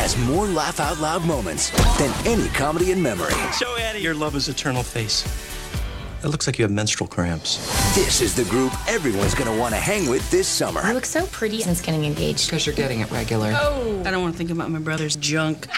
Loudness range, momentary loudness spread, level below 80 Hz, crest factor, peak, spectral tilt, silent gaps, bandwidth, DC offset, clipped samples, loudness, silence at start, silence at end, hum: 3 LU; 6 LU; -32 dBFS; 16 dB; -6 dBFS; -4 dB/octave; none; 16.5 kHz; 0.1%; under 0.1%; -22 LUFS; 0 s; 0 s; none